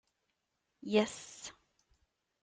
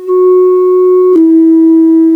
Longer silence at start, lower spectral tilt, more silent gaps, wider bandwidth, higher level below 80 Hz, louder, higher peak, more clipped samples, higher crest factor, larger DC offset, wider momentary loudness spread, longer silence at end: first, 0.85 s vs 0 s; second, -4 dB/octave vs -8 dB/octave; neither; first, 9.6 kHz vs 2.3 kHz; second, -78 dBFS vs -70 dBFS; second, -34 LUFS vs -6 LUFS; second, -16 dBFS vs 0 dBFS; neither; first, 24 dB vs 6 dB; neither; first, 18 LU vs 2 LU; first, 0.9 s vs 0 s